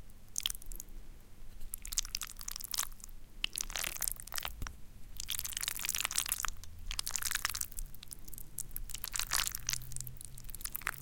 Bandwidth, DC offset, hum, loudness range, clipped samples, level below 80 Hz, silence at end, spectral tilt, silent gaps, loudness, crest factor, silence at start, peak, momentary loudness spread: 17 kHz; under 0.1%; none; 4 LU; under 0.1%; -48 dBFS; 0 s; 0.5 dB/octave; none; -37 LUFS; 32 dB; 0 s; -8 dBFS; 15 LU